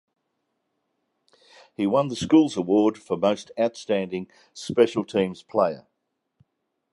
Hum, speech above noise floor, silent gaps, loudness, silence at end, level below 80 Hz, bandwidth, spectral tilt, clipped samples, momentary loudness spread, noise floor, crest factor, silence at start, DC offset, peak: none; 55 dB; none; -24 LUFS; 1.15 s; -62 dBFS; 11.5 kHz; -6 dB/octave; under 0.1%; 14 LU; -78 dBFS; 20 dB; 1.8 s; under 0.1%; -4 dBFS